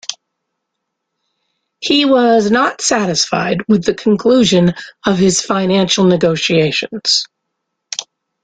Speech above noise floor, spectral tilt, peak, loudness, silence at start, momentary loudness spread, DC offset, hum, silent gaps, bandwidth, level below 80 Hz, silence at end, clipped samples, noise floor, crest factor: 62 dB; -4 dB/octave; 0 dBFS; -13 LUFS; 0.1 s; 13 LU; under 0.1%; none; none; 9.4 kHz; -52 dBFS; 0.4 s; under 0.1%; -75 dBFS; 14 dB